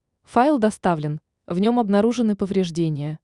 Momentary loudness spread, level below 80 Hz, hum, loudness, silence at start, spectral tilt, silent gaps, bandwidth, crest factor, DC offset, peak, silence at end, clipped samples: 8 LU; -56 dBFS; none; -21 LUFS; 0.3 s; -7 dB/octave; none; 11 kHz; 16 dB; under 0.1%; -6 dBFS; 0.05 s; under 0.1%